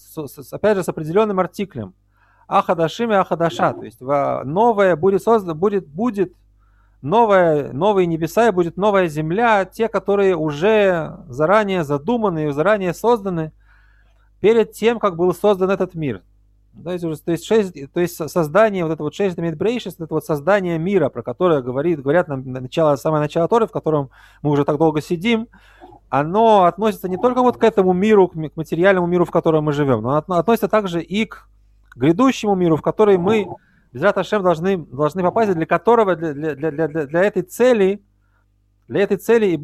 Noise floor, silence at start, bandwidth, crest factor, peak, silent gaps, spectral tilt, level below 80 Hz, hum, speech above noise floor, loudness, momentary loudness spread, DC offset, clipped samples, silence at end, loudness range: -60 dBFS; 0.1 s; 14.5 kHz; 16 dB; -2 dBFS; none; -7 dB/octave; -52 dBFS; none; 43 dB; -18 LUFS; 10 LU; under 0.1%; under 0.1%; 0 s; 3 LU